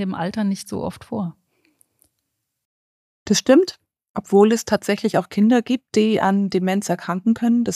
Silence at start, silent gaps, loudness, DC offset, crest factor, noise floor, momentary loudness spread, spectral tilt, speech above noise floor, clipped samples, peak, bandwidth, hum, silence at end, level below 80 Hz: 0 s; 2.65-3.26 s, 4.09-4.14 s; -19 LUFS; under 0.1%; 18 dB; -76 dBFS; 13 LU; -5.5 dB/octave; 58 dB; under 0.1%; -2 dBFS; 15 kHz; none; 0 s; -58 dBFS